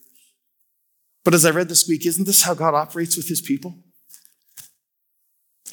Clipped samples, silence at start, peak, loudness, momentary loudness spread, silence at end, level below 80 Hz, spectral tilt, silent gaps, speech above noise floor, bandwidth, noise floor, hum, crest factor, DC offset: under 0.1%; 1.25 s; -2 dBFS; -18 LUFS; 10 LU; 0 s; -68 dBFS; -3 dB/octave; none; 52 dB; 19.5 kHz; -71 dBFS; none; 20 dB; under 0.1%